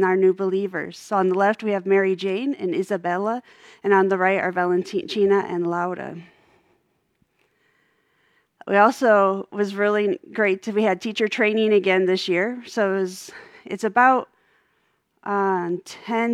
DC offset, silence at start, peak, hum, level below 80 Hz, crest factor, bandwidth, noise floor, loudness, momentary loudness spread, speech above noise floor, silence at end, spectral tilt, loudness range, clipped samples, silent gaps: under 0.1%; 0 s; -2 dBFS; none; -76 dBFS; 20 dB; 12.5 kHz; -68 dBFS; -21 LUFS; 12 LU; 47 dB; 0 s; -5.5 dB/octave; 5 LU; under 0.1%; none